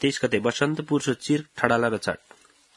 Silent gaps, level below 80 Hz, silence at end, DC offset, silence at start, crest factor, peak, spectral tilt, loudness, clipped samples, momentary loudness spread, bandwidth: none; -62 dBFS; 0.6 s; under 0.1%; 0 s; 24 dB; 0 dBFS; -5 dB/octave; -25 LUFS; under 0.1%; 6 LU; 12 kHz